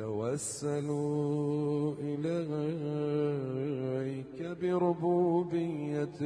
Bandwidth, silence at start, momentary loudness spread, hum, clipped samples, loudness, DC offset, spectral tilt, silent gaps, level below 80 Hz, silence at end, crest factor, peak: 11 kHz; 0 s; 6 LU; none; under 0.1%; -33 LUFS; under 0.1%; -7 dB/octave; none; -70 dBFS; 0 s; 14 dB; -18 dBFS